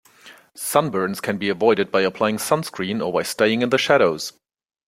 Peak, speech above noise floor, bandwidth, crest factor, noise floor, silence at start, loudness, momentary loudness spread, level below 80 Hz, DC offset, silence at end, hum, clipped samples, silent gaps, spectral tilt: 0 dBFS; 28 dB; 16.5 kHz; 20 dB; -48 dBFS; 0.25 s; -20 LUFS; 8 LU; -62 dBFS; under 0.1%; 0.55 s; none; under 0.1%; none; -4 dB/octave